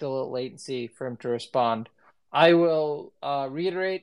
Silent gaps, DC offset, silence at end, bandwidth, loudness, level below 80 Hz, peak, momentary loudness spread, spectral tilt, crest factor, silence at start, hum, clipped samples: none; under 0.1%; 0.05 s; 11 kHz; -26 LUFS; -80 dBFS; -6 dBFS; 15 LU; -6 dB/octave; 20 dB; 0 s; none; under 0.1%